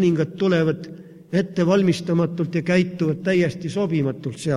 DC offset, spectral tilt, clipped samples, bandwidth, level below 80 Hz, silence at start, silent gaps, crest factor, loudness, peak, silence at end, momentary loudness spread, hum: under 0.1%; -7 dB/octave; under 0.1%; 11.5 kHz; -58 dBFS; 0 s; none; 14 dB; -21 LUFS; -6 dBFS; 0 s; 7 LU; none